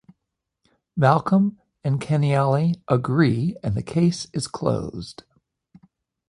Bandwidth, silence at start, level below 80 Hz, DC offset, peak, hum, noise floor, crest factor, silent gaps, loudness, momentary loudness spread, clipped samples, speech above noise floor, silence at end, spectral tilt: 11 kHz; 0.95 s; -52 dBFS; under 0.1%; -2 dBFS; none; -81 dBFS; 20 dB; none; -22 LUFS; 11 LU; under 0.1%; 60 dB; 1.15 s; -7 dB/octave